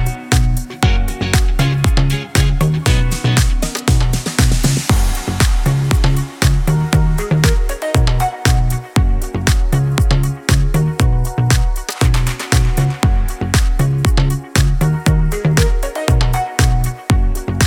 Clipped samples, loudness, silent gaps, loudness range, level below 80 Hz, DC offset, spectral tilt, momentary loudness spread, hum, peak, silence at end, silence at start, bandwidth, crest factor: under 0.1%; -16 LUFS; none; 1 LU; -16 dBFS; under 0.1%; -5 dB/octave; 3 LU; none; -2 dBFS; 0 s; 0 s; 17.5 kHz; 12 dB